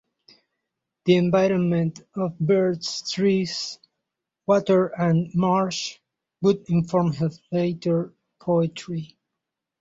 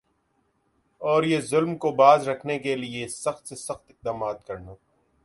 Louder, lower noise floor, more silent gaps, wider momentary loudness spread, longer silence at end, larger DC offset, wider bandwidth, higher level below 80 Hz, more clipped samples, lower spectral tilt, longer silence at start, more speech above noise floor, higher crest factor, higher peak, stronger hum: about the same, -23 LUFS vs -24 LUFS; first, -84 dBFS vs -70 dBFS; neither; second, 13 LU vs 18 LU; first, 0.75 s vs 0.5 s; neither; second, 7.8 kHz vs 11.5 kHz; about the same, -62 dBFS vs -62 dBFS; neither; first, -6.5 dB/octave vs -5 dB/octave; about the same, 1.05 s vs 1 s; first, 62 dB vs 46 dB; about the same, 18 dB vs 22 dB; about the same, -6 dBFS vs -4 dBFS; neither